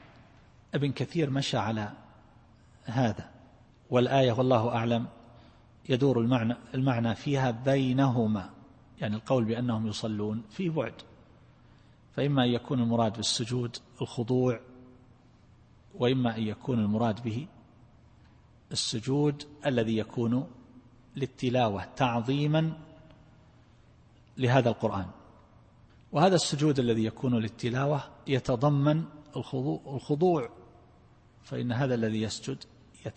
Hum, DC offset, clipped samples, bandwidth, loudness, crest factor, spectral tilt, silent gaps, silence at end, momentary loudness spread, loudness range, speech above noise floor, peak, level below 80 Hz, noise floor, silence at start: none; under 0.1%; under 0.1%; 8.8 kHz; -29 LUFS; 22 dB; -6 dB/octave; none; 0.05 s; 12 LU; 4 LU; 30 dB; -8 dBFS; -60 dBFS; -58 dBFS; 0.75 s